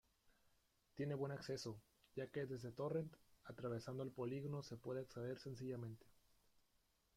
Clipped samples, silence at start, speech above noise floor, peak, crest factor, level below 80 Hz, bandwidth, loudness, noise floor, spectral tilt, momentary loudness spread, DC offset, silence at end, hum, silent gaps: under 0.1%; 0.25 s; 33 dB; -34 dBFS; 16 dB; -78 dBFS; 16 kHz; -49 LUFS; -81 dBFS; -6.5 dB/octave; 10 LU; under 0.1%; 1.05 s; none; none